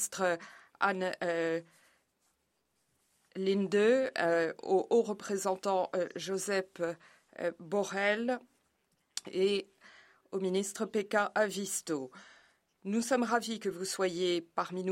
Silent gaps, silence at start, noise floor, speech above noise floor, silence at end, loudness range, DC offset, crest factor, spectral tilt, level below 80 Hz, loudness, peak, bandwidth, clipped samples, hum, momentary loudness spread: none; 0 s; -79 dBFS; 46 dB; 0 s; 5 LU; under 0.1%; 20 dB; -4 dB/octave; -82 dBFS; -33 LUFS; -14 dBFS; 16 kHz; under 0.1%; none; 10 LU